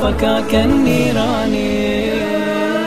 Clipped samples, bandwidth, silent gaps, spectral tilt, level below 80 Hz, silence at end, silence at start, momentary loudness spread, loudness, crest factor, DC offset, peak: under 0.1%; 15.5 kHz; none; -5.5 dB/octave; -30 dBFS; 0 s; 0 s; 4 LU; -16 LUFS; 14 dB; 3%; -2 dBFS